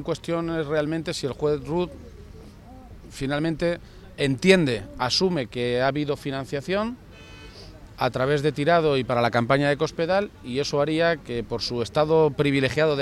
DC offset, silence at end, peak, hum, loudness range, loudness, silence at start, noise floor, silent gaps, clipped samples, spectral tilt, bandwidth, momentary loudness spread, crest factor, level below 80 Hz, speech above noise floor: under 0.1%; 0 s; -4 dBFS; none; 6 LU; -24 LUFS; 0 s; -44 dBFS; none; under 0.1%; -5.5 dB/octave; 13.5 kHz; 13 LU; 20 dB; -48 dBFS; 21 dB